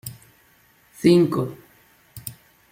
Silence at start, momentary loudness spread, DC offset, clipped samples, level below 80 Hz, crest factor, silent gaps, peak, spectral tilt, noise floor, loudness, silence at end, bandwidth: 0.05 s; 21 LU; under 0.1%; under 0.1%; -60 dBFS; 20 dB; none; -4 dBFS; -6.5 dB/octave; -58 dBFS; -20 LUFS; 0.4 s; 16.5 kHz